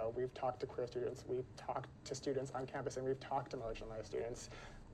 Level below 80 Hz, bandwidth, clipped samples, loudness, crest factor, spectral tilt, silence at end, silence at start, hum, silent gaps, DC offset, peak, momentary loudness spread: -62 dBFS; 12 kHz; under 0.1%; -44 LUFS; 16 dB; -5.5 dB/octave; 0 s; 0 s; none; none; under 0.1%; -28 dBFS; 6 LU